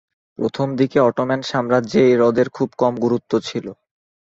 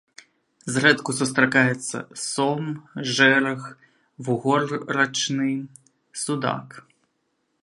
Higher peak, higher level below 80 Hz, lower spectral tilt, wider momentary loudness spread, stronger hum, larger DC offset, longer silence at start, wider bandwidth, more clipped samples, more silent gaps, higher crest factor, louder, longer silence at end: about the same, -2 dBFS vs -2 dBFS; first, -58 dBFS vs -70 dBFS; first, -6.5 dB/octave vs -4 dB/octave; second, 10 LU vs 15 LU; neither; neither; second, 0.4 s vs 0.65 s; second, 7.8 kHz vs 11.5 kHz; neither; neither; second, 16 dB vs 22 dB; first, -18 LUFS vs -22 LUFS; second, 0.5 s vs 0.85 s